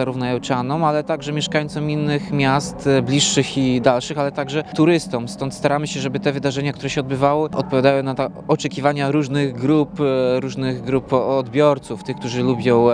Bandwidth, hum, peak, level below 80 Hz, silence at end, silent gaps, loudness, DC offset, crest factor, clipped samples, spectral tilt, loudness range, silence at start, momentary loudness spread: 10.5 kHz; none; 0 dBFS; -50 dBFS; 0 s; none; -19 LUFS; under 0.1%; 18 dB; under 0.1%; -5.5 dB/octave; 2 LU; 0 s; 7 LU